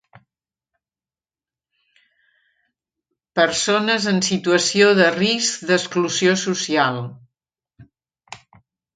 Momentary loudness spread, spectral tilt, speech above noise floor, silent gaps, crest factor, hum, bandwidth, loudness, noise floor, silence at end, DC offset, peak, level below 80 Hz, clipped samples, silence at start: 7 LU; -3.5 dB/octave; over 72 dB; none; 22 dB; none; 9.6 kHz; -18 LUFS; under -90 dBFS; 0.6 s; under 0.1%; 0 dBFS; -64 dBFS; under 0.1%; 3.35 s